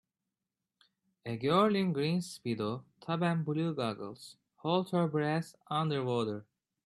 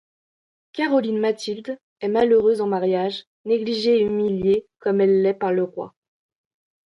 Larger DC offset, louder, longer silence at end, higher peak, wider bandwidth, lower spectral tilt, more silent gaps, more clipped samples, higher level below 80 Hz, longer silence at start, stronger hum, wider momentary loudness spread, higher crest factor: neither; second, -33 LUFS vs -21 LUFS; second, 0.45 s vs 0.95 s; second, -14 dBFS vs -8 dBFS; about the same, 12.5 kHz vs 11.5 kHz; about the same, -7 dB/octave vs -6.5 dB/octave; second, none vs 1.83-1.96 s, 3.27-3.44 s; neither; second, -74 dBFS vs -60 dBFS; first, 1.25 s vs 0.75 s; neither; about the same, 14 LU vs 13 LU; first, 20 dB vs 14 dB